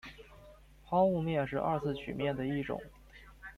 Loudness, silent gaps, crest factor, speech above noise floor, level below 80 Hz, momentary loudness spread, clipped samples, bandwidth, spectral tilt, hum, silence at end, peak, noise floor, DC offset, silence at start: -33 LUFS; none; 18 dB; 24 dB; -58 dBFS; 21 LU; under 0.1%; 14 kHz; -8 dB/octave; none; 0 s; -18 dBFS; -56 dBFS; under 0.1%; 0.05 s